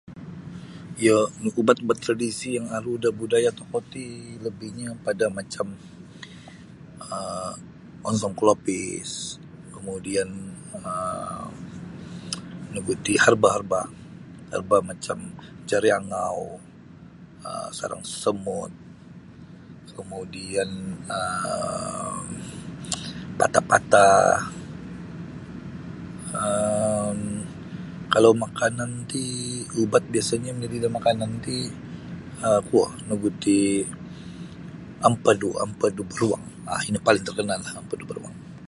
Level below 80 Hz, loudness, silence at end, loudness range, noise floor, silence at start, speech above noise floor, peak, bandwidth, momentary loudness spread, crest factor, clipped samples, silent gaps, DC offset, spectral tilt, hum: -54 dBFS; -25 LUFS; 0.05 s; 10 LU; -46 dBFS; 0.05 s; 22 dB; 0 dBFS; 11.5 kHz; 19 LU; 24 dB; under 0.1%; none; under 0.1%; -4.5 dB/octave; none